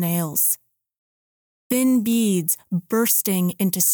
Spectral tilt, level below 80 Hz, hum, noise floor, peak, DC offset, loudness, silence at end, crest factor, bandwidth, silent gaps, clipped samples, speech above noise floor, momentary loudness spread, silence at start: -4.5 dB/octave; -70 dBFS; none; under -90 dBFS; -4 dBFS; under 0.1%; -20 LUFS; 0 s; 18 dB; over 20 kHz; 0.98-1.70 s; under 0.1%; over 70 dB; 6 LU; 0 s